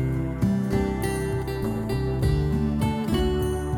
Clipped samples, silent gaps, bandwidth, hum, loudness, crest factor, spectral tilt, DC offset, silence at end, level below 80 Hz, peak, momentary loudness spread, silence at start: under 0.1%; none; 18.5 kHz; none; -25 LUFS; 14 dB; -7 dB/octave; under 0.1%; 0 s; -32 dBFS; -12 dBFS; 4 LU; 0 s